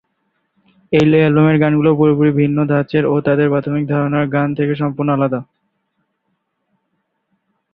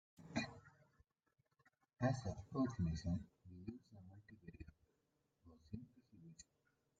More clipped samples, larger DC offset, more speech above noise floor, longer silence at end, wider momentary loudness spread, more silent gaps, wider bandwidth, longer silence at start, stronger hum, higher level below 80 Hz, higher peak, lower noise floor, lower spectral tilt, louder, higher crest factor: neither; neither; first, 56 dB vs 43 dB; first, 2.3 s vs 0.6 s; second, 6 LU vs 22 LU; neither; second, 6.8 kHz vs 9 kHz; first, 0.9 s vs 0.2 s; neither; first, -52 dBFS vs -66 dBFS; first, 0 dBFS vs -26 dBFS; second, -70 dBFS vs -85 dBFS; first, -9.5 dB/octave vs -6.5 dB/octave; first, -15 LUFS vs -46 LUFS; second, 16 dB vs 24 dB